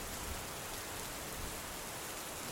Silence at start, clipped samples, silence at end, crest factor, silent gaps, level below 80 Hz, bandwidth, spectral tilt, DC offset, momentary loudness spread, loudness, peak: 0 s; under 0.1%; 0 s; 18 dB; none; -54 dBFS; 17 kHz; -2 dB/octave; under 0.1%; 1 LU; -42 LUFS; -26 dBFS